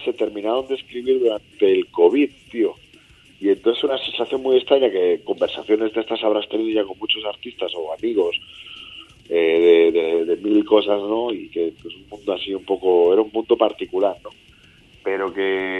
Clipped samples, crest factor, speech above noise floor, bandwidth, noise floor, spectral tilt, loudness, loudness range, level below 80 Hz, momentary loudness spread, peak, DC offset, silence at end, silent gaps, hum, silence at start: under 0.1%; 18 dB; 31 dB; 4.3 kHz; -50 dBFS; -5.5 dB/octave; -20 LUFS; 4 LU; -60 dBFS; 12 LU; -2 dBFS; under 0.1%; 0 s; none; none; 0 s